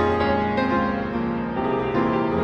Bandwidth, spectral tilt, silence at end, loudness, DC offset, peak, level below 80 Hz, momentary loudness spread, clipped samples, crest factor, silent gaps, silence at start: 6.6 kHz; -8 dB/octave; 0 s; -23 LUFS; under 0.1%; -8 dBFS; -42 dBFS; 4 LU; under 0.1%; 14 dB; none; 0 s